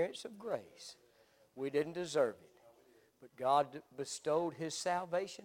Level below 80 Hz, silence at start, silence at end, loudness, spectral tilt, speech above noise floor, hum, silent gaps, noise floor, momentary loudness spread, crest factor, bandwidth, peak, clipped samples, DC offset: -84 dBFS; 0 s; 0 s; -38 LUFS; -4 dB/octave; 31 dB; none; none; -69 dBFS; 14 LU; 20 dB; 17 kHz; -18 dBFS; under 0.1%; under 0.1%